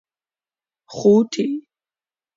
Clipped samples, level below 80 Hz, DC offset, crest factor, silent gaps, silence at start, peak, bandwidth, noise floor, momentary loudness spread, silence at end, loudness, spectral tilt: under 0.1%; -64 dBFS; under 0.1%; 18 dB; none; 0.9 s; -4 dBFS; 7.6 kHz; under -90 dBFS; 16 LU; 0.75 s; -18 LUFS; -6.5 dB/octave